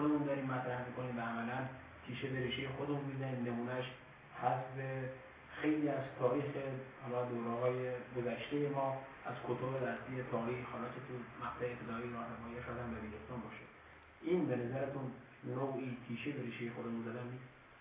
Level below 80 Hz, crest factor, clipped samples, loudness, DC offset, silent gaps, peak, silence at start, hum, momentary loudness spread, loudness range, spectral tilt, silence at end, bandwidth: -68 dBFS; 20 dB; under 0.1%; -41 LUFS; under 0.1%; none; -20 dBFS; 0 s; none; 11 LU; 4 LU; -5.5 dB/octave; 0 s; 3.9 kHz